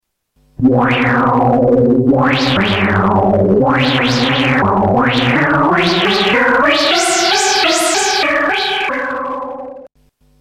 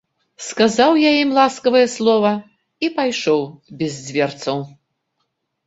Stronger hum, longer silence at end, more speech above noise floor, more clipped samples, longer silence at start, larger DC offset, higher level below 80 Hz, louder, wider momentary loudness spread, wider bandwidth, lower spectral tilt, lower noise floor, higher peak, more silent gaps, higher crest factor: neither; second, 0.6 s vs 1 s; second, 45 dB vs 56 dB; neither; first, 0.6 s vs 0.4 s; neither; first, -42 dBFS vs -62 dBFS; first, -12 LUFS vs -17 LUFS; second, 5 LU vs 13 LU; first, 15.5 kHz vs 8 kHz; about the same, -4 dB/octave vs -4.5 dB/octave; second, -57 dBFS vs -72 dBFS; about the same, -2 dBFS vs -2 dBFS; neither; second, 12 dB vs 18 dB